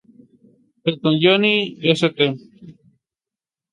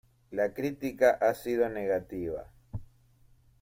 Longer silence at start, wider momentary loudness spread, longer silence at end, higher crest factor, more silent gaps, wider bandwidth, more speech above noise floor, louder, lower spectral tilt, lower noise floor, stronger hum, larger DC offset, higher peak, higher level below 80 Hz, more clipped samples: first, 0.85 s vs 0.3 s; second, 10 LU vs 19 LU; first, 1 s vs 0.75 s; about the same, 20 dB vs 22 dB; neither; second, 11 kHz vs 16.5 kHz; first, 72 dB vs 33 dB; first, -18 LUFS vs -30 LUFS; about the same, -6 dB/octave vs -6.5 dB/octave; first, -90 dBFS vs -62 dBFS; neither; neither; first, -2 dBFS vs -10 dBFS; second, -66 dBFS vs -56 dBFS; neither